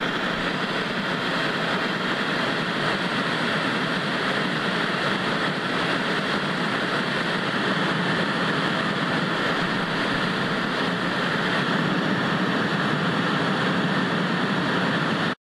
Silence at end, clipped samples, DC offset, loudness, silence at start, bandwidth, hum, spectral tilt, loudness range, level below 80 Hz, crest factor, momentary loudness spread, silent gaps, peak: 0.2 s; under 0.1%; under 0.1%; -23 LUFS; 0 s; 13 kHz; none; -5 dB/octave; 1 LU; -58 dBFS; 14 dB; 1 LU; none; -8 dBFS